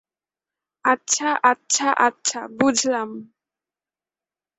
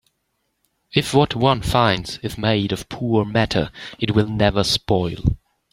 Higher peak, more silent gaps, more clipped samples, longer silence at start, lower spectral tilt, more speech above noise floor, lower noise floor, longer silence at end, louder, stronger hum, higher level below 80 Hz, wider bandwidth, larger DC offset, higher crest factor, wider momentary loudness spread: about the same, -2 dBFS vs 0 dBFS; neither; neither; about the same, 0.85 s vs 0.95 s; second, -1.5 dB/octave vs -5.5 dB/octave; first, over 69 dB vs 53 dB; first, under -90 dBFS vs -72 dBFS; first, 1.35 s vs 0.35 s; about the same, -20 LUFS vs -20 LUFS; neither; second, -68 dBFS vs -38 dBFS; second, 8.4 kHz vs 16 kHz; neither; about the same, 22 dB vs 20 dB; about the same, 8 LU vs 8 LU